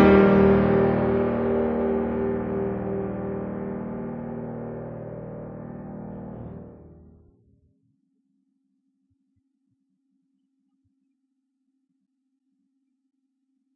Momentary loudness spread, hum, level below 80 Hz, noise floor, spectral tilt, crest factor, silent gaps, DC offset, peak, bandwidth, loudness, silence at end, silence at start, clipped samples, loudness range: 20 LU; none; -46 dBFS; -76 dBFS; -10.5 dB/octave; 22 dB; none; under 0.1%; -4 dBFS; 5.2 kHz; -23 LUFS; 6.8 s; 0 s; under 0.1%; 20 LU